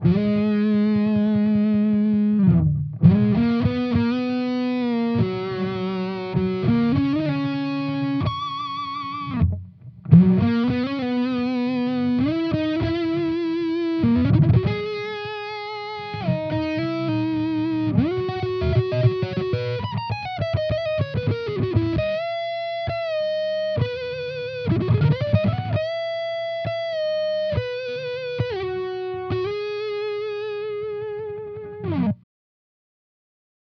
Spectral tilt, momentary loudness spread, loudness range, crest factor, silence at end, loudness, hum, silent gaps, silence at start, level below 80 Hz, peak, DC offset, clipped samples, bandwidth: -9.5 dB/octave; 10 LU; 7 LU; 18 dB; 1.55 s; -23 LUFS; none; none; 0 s; -46 dBFS; -4 dBFS; under 0.1%; under 0.1%; 6.2 kHz